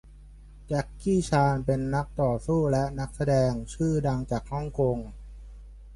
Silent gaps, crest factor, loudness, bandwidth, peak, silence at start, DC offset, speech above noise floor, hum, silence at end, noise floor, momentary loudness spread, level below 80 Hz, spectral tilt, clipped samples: none; 16 dB; -27 LUFS; 11.5 kHz; -12 dBFS; 0.05 s; under 0.1%; 22 dB; none; 0 s; -48 dBFS; 8 LU; -42 dBFS; -7.5 dB/octave; under 0.1%